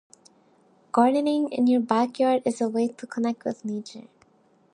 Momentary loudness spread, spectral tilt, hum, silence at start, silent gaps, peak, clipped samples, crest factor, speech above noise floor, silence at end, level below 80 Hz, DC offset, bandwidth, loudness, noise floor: 12 LU; -5.5 dB/octave; none; 0.95 s; none; -6 dBFS; under 0.1%; 20 dB; 38 dB; 0.7 s; -76 dBFS; under 0.1%; 11 kHz; -24 LUFS; -62 dBFS